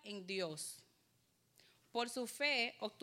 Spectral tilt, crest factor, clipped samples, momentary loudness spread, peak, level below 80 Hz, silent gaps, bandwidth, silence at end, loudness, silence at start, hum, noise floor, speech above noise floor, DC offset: -2 dB/octave; 20 dB; under 0.1%; 12 LU; -24 dBFS; under -90 dBFS; none; 16 kHz; 0.05 s; -40 LUFS; 0.05 s; none; -77 dBFS; 36 dB; under 0.1%